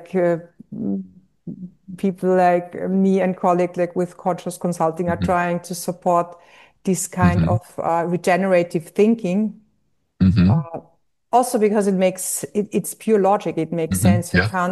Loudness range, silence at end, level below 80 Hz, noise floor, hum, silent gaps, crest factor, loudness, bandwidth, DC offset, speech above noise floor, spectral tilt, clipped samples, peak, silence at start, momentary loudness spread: 2 LU; 0 s; -48 dBFS; -69 dBFS; none; none; 16 dB; -20 LUFS; 12.5 kHz; under 0.1%; 50 dB; -6.5 dB/octave; under 0.1%; -4 dBFS; 0 s; 10 LU